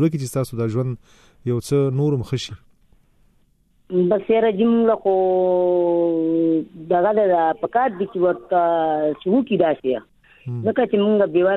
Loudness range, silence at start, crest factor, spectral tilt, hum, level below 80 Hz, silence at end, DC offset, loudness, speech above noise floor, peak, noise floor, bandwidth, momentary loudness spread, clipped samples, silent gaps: 6 LU; 0 s; 16 dB; -7.5 dB/octave; none; -56 dBFS; 0 s; under 0.1%; -20 LUFS; 41 dB; -4 dBFS; -59 dBFS; 13.5 kHz; 8 LU; under 0.1%; none